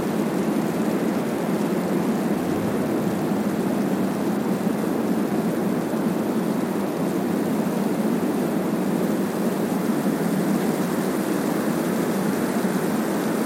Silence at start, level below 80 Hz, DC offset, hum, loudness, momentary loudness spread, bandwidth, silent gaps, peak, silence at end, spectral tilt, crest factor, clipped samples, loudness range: 0 s; -62 dBFS; under 0.1%; none; -23 LUFS; 1 LU; 17 kHz; none; -10 dBFS; 0 s; -6.5 dB/octave; 12 dB; under 0.1%; 1 LU